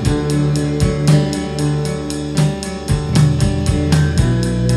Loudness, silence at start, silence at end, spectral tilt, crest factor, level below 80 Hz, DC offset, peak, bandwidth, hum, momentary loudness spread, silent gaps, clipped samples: -16 LUFS; 0 s; 0 s; -6.5 dB/octave; 14 dB; -26 dBFS; under 0.1%; -2 dBFS; 12.5 kHz; none; 6 LU; none; under 0.1%